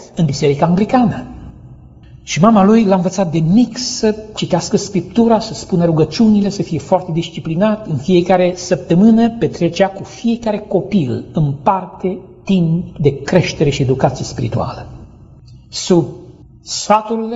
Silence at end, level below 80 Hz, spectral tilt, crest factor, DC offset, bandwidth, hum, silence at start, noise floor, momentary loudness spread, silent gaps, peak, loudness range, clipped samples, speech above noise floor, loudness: 0 s; -42 dBFS; -6.5 dB/octave; 14 dB; under 0.1%; 8 kHz; none; 0 s; -39 dBFS; 11 LU; none; 0 dBFS; 4 LU; under 0.1%; 25 dB; -15 LUFS